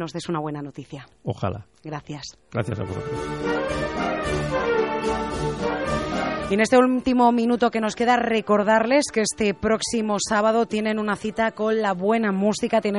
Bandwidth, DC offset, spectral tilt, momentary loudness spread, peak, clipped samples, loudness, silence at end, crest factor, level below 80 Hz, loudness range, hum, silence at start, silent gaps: 11.5 kHz; under 0.1%; -5 dB/octave; 13 LU; -6 dBFS; under 0.1%; -22 LUFS; 0 s; 18 dB; -46 dBFS; 9 LU; none; 0 s; none